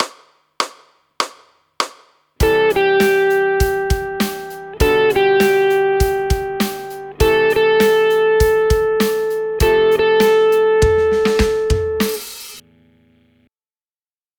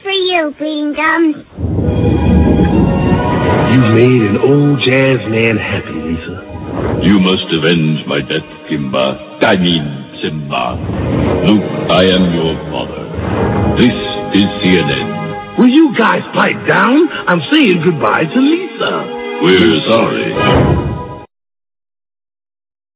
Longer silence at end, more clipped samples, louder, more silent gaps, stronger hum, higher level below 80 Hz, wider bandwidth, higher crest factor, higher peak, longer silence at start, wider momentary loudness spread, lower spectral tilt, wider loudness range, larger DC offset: about the same, 1.8 s vs 1.7 s; neither; second, -16 LUFS vs -12 LUFS; neither; neither; about the same, -28 dBFS vs -28 dBFS; first, over 20 kHz vs 4 kHz; about the same, 16 dB vs 12 dB; about the same, 0 dBFS vs 0 dBFS; about the same, 0 s vs 0.05 s; about the same, 11 LU vs 11 LU; second, -5 dB/octave vs -10.5 dB/octave; about the same, 4 LU vs 4 LU; neither